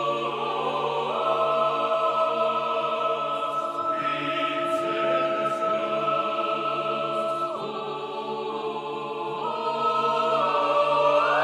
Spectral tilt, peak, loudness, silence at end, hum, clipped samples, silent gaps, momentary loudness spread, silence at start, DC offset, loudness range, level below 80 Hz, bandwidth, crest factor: -4.5 dB/octave; -8 dBFS; -25 LUFS; 0 s; none; under 0.1%; none; 9 LU; 0 s; under 0.1%; 4 LU; -82 dBFS; 12 kHz; 16 dB